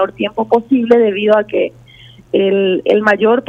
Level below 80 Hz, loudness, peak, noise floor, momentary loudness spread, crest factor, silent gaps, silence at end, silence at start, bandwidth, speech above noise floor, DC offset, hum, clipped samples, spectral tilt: -54 dBFS; -13 LUFS; 0 dBFS; -41 dBFS; 7 LU; 12 dB; none; 0.05 s; 0 s; 7.2 kHz; 28 dB; under 0.1%; none; under 0.1%; -7 dB/octave